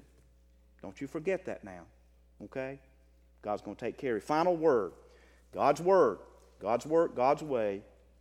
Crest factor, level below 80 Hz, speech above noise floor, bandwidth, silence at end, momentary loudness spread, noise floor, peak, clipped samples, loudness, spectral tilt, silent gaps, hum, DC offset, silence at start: 20 dB; -62 dBFS; 32 dB; 12.5 kHz; 0.4 s; 19 LU; -62 dBFS; -12 dBFS; under 0.1%; -31 LUFS; -6.5 dB/octave; none; none; under 0.1%; 0.85 s